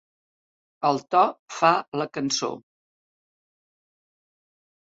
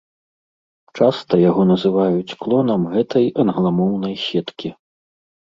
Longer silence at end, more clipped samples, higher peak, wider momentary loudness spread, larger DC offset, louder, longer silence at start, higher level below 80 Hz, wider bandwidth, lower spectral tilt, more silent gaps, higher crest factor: first, 2.35 s vs 0.7 s; neither; about the same, -4 dBFS vs -2 dBFS; about the same, 9 LU vs 8 LU; neither; second, -24 LUFS vs -18 LUFS; second, 0.8 s vs 0.95 s; second, -72 dBFS vs -58 dBFS; about the same, 8 kHz vs 7.4 kHz; second, -3.5 dB/octave vs -8.5 dB/octave; first, 1.39-1.48 s, 1.88-1.92 s vs none; first, 24 dB vs 16 dB